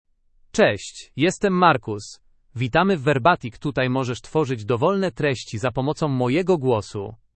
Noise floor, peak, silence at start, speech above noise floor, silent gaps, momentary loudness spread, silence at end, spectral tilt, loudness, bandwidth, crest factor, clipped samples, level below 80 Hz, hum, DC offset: -51 dBFS; -2 dBFS; 0.55 s; 29 dB; none; 13 LU; 0.2 s; -6 dB/octave; -21 LUFS; 8.8 kHz; 20 dB; under 0.1%; -52 dBFS; none; under 0.1%